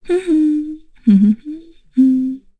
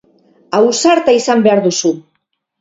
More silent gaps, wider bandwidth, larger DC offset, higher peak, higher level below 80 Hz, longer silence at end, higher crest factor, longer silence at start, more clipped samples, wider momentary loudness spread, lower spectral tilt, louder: neither; first, 9.4 kHz vs 7.8 kHz; neither; about the same, -2 dBFS vs 0 dBFS; first, -48 dBFS vs -58 dBFS; second, 0.2 s vs 0.6 s; about the same, 14 dB vs 14 dB; second, 0.05 s vs 0.5 s; neither; first, 16 LU vs 8 LU; first, -9 dB/octave vs -4 dB/octave; second, -15 LUFS vs -12 LUFS